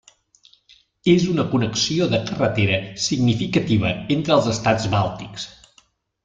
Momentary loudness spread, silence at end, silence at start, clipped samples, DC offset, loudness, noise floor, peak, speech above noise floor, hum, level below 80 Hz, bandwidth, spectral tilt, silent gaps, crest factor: 7 LU; 0.75 s; 1.05 s; under 0.1%; under 0.1%; -20 LUFS; -59 dBFS; -4 dBFS; 39 dB; none; -50 dBFS; 9.2 kHz; -5 dB/octave; none; 18 dB